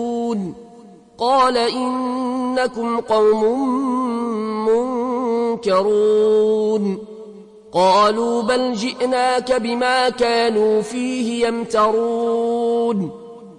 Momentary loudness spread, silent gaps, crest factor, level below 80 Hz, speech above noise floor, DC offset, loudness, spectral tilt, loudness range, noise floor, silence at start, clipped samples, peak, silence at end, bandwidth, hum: 8 LU; none; 14 dB; -56 dBFS; 26 dB; under 0.1%; -18 LUFS; -5 dB/octave; 2 LU; -43 dBFS; 0 s; under 0.1%; -4 dBFS; 0.05 s; 11 kHz; none